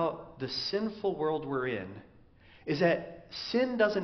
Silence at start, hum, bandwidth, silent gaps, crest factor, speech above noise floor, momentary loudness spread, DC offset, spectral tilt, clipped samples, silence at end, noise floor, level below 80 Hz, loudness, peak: 0 s; none; 6.4 kHz; none; 20 dB; 26 dB; 14 LU; under 0.1%; -3.5 dB/octave; under 0.1%; 0 s; -58 dBFS; -64 dBFS; -32 LUFS; -12 dBFS